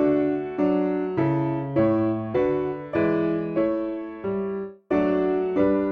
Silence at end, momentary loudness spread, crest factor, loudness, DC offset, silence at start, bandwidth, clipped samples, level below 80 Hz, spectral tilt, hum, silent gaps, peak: 0 s; 7 LU; 14 dB; -24 LUFS; under 0.1%; 0 s; 5 kHz; under 0.1%; -54 dBFS; -10 dB/octave; none; none; -10 dBFS